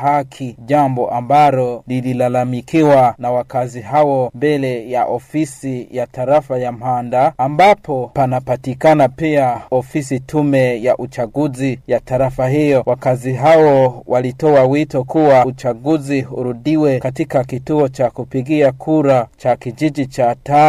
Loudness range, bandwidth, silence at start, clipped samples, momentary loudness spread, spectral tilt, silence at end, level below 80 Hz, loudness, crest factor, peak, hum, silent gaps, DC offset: 4 LU; 14.5 kHz; 0 s; under 0.1%; 9 LU; -7.5 dB/octave; 0 s; -48 dBFS; -15 LUFS; 12 dB; -2 dBFS; none; none; under 0.1%